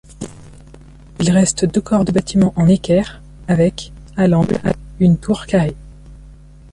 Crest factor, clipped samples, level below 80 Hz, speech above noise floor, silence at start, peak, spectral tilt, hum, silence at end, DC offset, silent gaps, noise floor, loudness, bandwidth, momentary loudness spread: 14 dB; under 0.1%; -38 dBFS; 25 dB; 0.2 s; -2 dBFS; -6.5 dB/octave; none; 0.4 s; under 0.1%; none; -40 dBFS; -16 LUFS; 11.5 kHz; 18 LU